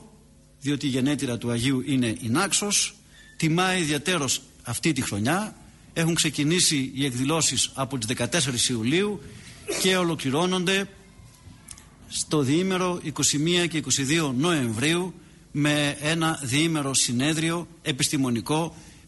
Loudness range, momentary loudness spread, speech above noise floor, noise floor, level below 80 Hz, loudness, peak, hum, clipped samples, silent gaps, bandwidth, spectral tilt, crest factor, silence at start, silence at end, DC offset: 2 LU; 8 LU; 29 dB; -53 dBFS; -54 dBFS; -24 LUFS; -8 dBFS; none; under 0.1%; none; 12 kHz; -3.5 dB/octave; 16 dB; 0 s; 0.15 s; under 0.1%